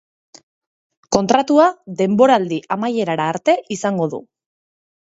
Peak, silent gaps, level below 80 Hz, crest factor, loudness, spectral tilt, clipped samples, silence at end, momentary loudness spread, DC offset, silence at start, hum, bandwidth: 0 dBFS; none; -56 dBFS; 18 dB; -17 LUFS; -5.5 dB/octave; under 0.1%; 0.85 s; 9 LU; under 0.1%; 1.1 s; none; 8 kHz